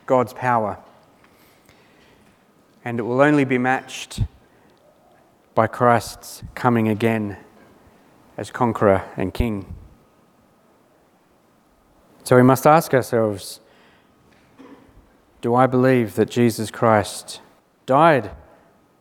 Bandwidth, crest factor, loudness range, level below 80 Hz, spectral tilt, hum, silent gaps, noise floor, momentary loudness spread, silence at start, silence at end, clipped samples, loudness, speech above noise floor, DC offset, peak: 18 kHz; 22 dB; 5 LU; -46 dBFS; -6.5 dB/octave; none; none; -58 dBFS; 20 LU; 0.1 s; 0.65 s; under 0.1%; -19 LUFS; 39 dB; under 0.1%; 0 dBFS